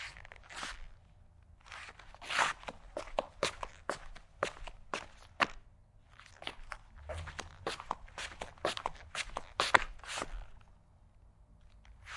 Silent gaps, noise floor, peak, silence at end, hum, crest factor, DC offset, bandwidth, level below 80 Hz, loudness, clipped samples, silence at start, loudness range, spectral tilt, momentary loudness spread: none; -62 dBFS; -4 dBFS; 0 s; none; 38 dB; under 0.1%; 11.5 kHz; -54 dBFS; -38 LUFS; under 0.1%; 0 s; 6 LU; -2 dB/octave; 20 LU